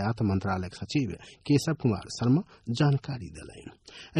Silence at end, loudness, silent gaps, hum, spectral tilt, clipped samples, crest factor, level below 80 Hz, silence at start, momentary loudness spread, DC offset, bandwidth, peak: 0 s; -29 LUFS; none; none; -6.5 dB/octave; under 0.1%; 18 dB; -56 dBFS; 0 s; 19 LU; under 0.1%; 11.5 kHz; -12 dBFS